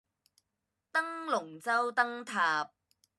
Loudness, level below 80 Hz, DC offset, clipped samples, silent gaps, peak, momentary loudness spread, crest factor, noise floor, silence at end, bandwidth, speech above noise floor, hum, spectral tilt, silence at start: -32 LUFS; under -90 dBFS; under 0.1%; under 0.1%; none; -14 dBFS; 5 LU; 20 dB; -86 dBFS; 0.5 s; 13 kHz; 54 dB; none; -2.5 dB/octave; 0.95 s